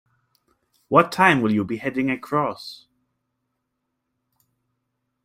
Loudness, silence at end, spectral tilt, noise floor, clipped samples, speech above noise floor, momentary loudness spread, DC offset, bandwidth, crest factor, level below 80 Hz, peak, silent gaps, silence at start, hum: -20 LUFS; 2.5 s; -6 dB/octave; -78 dBFS; under 0.1%; 57 dB; 11 LU; under 0.1%; 15.5 kHz; 22 dB; -64 dBFS; -2 dBFS; none; 0.9 s; none